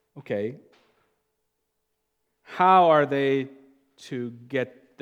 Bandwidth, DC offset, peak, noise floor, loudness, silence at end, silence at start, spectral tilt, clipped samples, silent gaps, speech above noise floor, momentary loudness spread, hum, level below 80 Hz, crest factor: 9.8 kHz; under 0.1%; -6 dBFS; -78 dBFS; -23 LUFS; 0.35 s; 0.15 s; -7 dB/octave; under 0.1%; none; 55 dB; 19 LU; none; -84 dBFS; 20 dB